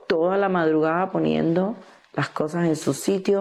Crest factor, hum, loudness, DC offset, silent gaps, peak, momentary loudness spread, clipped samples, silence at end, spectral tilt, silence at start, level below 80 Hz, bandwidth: 14 dB; none; -23 LUFS; under 0.1%; none; -10 dBFS; 8 LU; under 0.1%; 0 s; -6 dB/octave; 0.1 s; -62 dBFS; 13.5 kHz